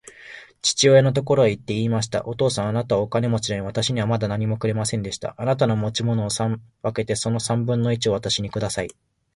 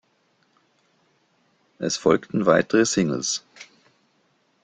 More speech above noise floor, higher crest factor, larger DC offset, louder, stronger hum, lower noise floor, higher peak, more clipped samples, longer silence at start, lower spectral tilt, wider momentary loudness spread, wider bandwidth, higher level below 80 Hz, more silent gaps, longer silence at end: second, 22 dB vs 45 dB; about the same, 18 dB vs 22 dB; neither; about the same, -22 LUFS vs -22 LUFS; neither; second, -43 dBFS vs -66 dBFS; about the same, -4 dBFS vs -4 dBFS; neither; second, 0.05 s vs 1.8 s; about the same, -5 dB/octave vs -4 dB/octave; about the same, 9 LU vs 10 LU; first, 11.5 kHz vs 9.6 kHz; first, -50 dBFS vs -62 dBFS; neither; second, 0.45 s vs 1 s